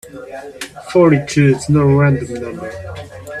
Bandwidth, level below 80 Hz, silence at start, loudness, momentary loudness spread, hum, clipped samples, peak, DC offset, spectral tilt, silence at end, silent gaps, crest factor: 12.5 kHz; -44 dBFS; 0.05 s; -14 LUFS; 19 LU; none; under 0.1%; 0 dBFS; under 0.1%; -7 dB/octave; 0 s; none; 16 dB